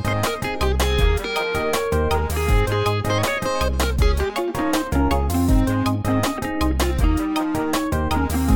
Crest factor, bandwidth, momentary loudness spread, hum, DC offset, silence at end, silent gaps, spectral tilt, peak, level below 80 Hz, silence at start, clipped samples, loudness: 14 dB; 19.5 kHz; 3 LU; none; 1%; 0 s; none; -5.5 dB/octave; -6 dBFS; -24 dBFS; 0 s; under 0.1%; -21 LUFS